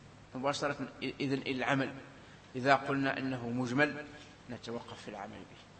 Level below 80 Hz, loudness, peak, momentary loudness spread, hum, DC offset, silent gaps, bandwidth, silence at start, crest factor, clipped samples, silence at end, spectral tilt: -68 dBFS; -34 LUFS; -10 dBFS; 19 LU; none; under 0.1%; none; 8.4 kHz; 0 s; 26 dB; under 0.1%; 0 s; -5.5 dB/octave